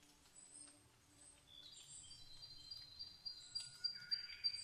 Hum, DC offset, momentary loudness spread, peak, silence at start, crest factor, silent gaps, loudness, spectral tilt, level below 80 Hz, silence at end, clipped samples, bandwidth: none; under 0.1%; 21 LU; -30 dBFS; 0 s; 22 dB; none; -48 LUFS; 0.5 dB/octave; -76 dBFS; 0 s; under 0.1%; 13 kHz